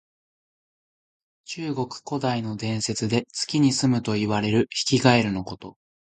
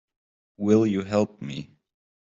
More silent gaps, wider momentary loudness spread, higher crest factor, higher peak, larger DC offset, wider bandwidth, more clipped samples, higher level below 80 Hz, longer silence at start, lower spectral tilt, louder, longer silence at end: neither; second, 12 LU vs 15 LU; first, 24 dB vs 18 dB; first, -2 dBFS vs -8 dBFS; neither; first, 9.4 kHz vs 7.6 kHz; neither; first, -56 dBFS vs -66 dBFS; first, 1.5 s vs 0.6 s; second, -5 dB/octave vs -7.5 dB/octave; about the same, -24 LUFS vs -24 LUFS; second, 0.45 s vs 0.6 s